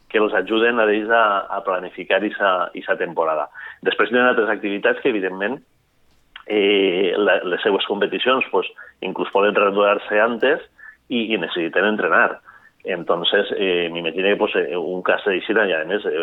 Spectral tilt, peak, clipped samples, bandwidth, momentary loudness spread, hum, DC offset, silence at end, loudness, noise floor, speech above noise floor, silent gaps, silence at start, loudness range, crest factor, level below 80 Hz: -7 dB/octave; -2 dBFS; under 0.1%; 4.1 kHz; 9 LU; none; under 0.1%; 0 s; -19 LUFS; -58 dBFS; 39 dB; none; 0.15 s; 2 LU; 18 dB; -66 dBFS